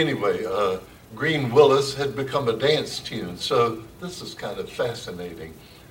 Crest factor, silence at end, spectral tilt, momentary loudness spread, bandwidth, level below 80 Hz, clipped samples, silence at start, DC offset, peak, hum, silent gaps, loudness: 22 dB; 0.1 s; -5 dB/octave; 17 LU; 17 kHz; -56 dBFS; under 0.1%; 0 s; under 0.1%; -2 dBFS; none; none; -23 LUFS